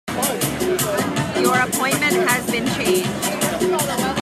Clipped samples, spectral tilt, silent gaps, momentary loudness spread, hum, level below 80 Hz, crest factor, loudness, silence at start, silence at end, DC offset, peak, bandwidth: under 0.1%; -3.5 dB/octave; none; 4 LU; none; -48 dBFS; 16 dB; -19 LUFS; 0.05 s; 0 s; under 0.1%; -4 dBFS; 16 kHz